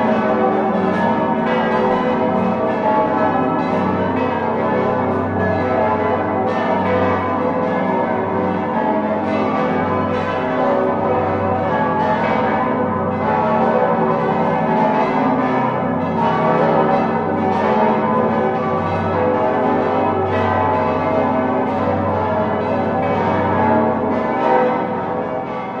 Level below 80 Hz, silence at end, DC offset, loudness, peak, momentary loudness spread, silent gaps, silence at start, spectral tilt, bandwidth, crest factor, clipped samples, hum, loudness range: -44 dBFS; 0 s; under 0.1%; -17 LUFS; -2 dBFS; 3 LU; none; 0 s; -8.5 dB/octave; 7 kHz; 14 dB; under 0.1%; none; 2 LU